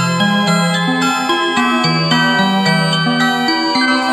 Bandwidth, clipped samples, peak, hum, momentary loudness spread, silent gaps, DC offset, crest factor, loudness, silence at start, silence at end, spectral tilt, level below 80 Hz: 13.5 kHz; under 0.1%; 0 dBFS; none; 2 LU; none; under 0.1%; 12 dB; -13 LUFS; 0 s; 0 s; -4.5 dB/octave; -62 dBFS